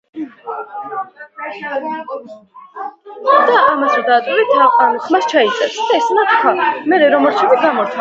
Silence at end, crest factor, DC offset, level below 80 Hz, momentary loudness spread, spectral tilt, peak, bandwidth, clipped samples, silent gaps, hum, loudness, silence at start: 0 s; 14 dB; under 0.1%; -66 dBFS; 18 LU; -3.5 dB/octave; 0 dBFS; 7.8 kHz; under 0.1%; none; none; -13 LUFS; 0.15 s